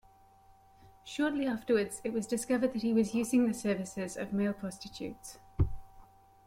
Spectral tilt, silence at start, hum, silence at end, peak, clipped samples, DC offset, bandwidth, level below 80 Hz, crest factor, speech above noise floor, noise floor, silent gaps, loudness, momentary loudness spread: -5.5 dB/octave; 1.05 s; none; 0.45 s; -16 dBFS; under 0.1%; under 0.1%; 16 kHz; -50 dBFS; 16 dB; 29 dB; -61 dBFS; none; -33 LUFS; 14 LU